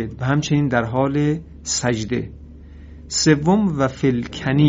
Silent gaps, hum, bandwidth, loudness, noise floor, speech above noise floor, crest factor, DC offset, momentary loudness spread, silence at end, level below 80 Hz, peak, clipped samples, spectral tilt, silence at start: none; none; 8 kHz; -20 LUFS; -39 dBFS; 20 dB; 18 dB; under 0.1%; 9 LU; 0 s; -42 dBFS; -2 dBFS; under 0.1%; -5.5 dB/octave; 0 s